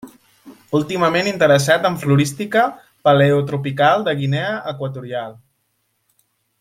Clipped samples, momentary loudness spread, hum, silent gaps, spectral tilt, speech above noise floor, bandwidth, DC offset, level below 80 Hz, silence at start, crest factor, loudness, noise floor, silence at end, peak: under 0.1%; 12 LU; none; none; -5.5 dB/octave; 51 dB; 15.5 kHz; under 0.1%; -58 dBFS; 0.05 s; 16 dB; -17 LUFS; -68 dBFS; 1.3 s; -2 dBFS